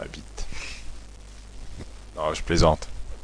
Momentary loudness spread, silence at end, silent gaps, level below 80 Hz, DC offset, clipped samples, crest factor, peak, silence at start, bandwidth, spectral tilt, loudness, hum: 24 LU; 0 s; none; -34 dBFS; under 0.1%; under 0.1%; 22 dB; -6 dBFS; 0 s; 10.5 kHz; -5 dB/octave; -26 LUFS; none